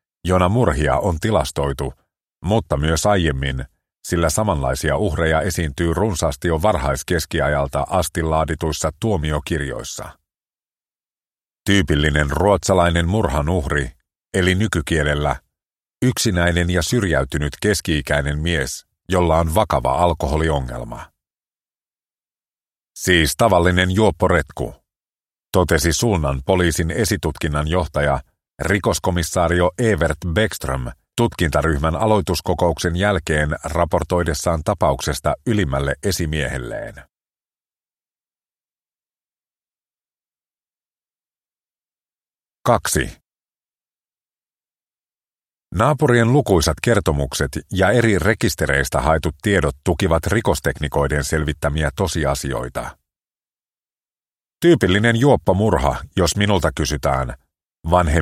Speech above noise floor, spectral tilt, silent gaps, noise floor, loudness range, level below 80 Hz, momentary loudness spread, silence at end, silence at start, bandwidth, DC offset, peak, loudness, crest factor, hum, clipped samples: over 72 dB; -5 dB/octave; 53.78-53.82 s; under -90 dBFS; 7 LU; -32 dBFS; 9 LU; 0 s; 0.25 s; 16 kHz; under 0.1%; 0 dBFS; -19 LUFS; 20 dB; none; under 0.1%